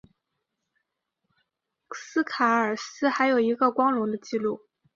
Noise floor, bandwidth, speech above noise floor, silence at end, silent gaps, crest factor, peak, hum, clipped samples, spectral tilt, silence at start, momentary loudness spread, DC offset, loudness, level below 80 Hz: -81 dBFS; 7.6 kHz; 57 dB; 0.4 s; none; 20 dB; -8 dBFS; none; under 0.1%; -4.5 dB/octave; 1.9 s; 10 LU; under 0.1%; -25 LUFS; -76 dBFS